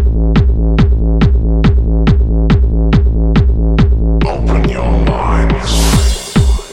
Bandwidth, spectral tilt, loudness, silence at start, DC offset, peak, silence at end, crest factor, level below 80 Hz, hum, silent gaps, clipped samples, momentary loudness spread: 13 kHz; -6.5 dB/octave; -12 LUFS; 0 s; under 0.1%; 0 dBFS; 0 s; 10 dB; -12 dBFS; none; none; under 0.1%; 2 LU